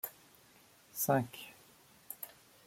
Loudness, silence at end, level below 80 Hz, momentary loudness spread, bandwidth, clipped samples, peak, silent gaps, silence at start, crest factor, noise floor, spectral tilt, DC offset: -37 LUFS; 0.4 s; -78 dBFS; 19 LU; 16.5 kHz; under 0.1%; -16 dBFS; none; 0.05 s; 24 dB; -64 dBFS; -5 dB/octave; under 0.1%